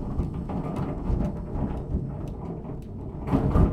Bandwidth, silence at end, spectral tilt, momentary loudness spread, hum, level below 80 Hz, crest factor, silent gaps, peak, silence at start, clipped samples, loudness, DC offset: 9.6 kHz; 0 s; -10 dB/octave; 11 LU; none; -32 dBFS; 20 dB; none; -8 dBFS; 0 s; under 0.1%; -30 LUFS; under 0.1%